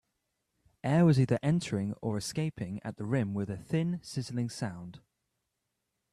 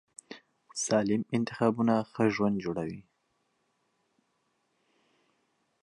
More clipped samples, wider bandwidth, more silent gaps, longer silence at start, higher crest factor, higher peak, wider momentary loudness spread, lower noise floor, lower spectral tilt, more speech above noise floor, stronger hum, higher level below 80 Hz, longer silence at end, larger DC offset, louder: neither; first, 13 kHz vs 11 kHz; neither; first, 0.85 s vs 0.3 s; about the same, 18 dB vs 20 dB; about the same, -14 dBFS vs -12 dBFS; second, 14 LU vs 21 LU; first, -83 dBFS vs -76 dBFS; first, -7 dB/octave vs -5.5 dB/octave; first, 53 dB vs 47 dB; neither; about the same, -64 dBFS vs -68 dBFS; second, 1.15 s vs 2.8 s; neither; about the same, -31 LUFS vs -29 LUFS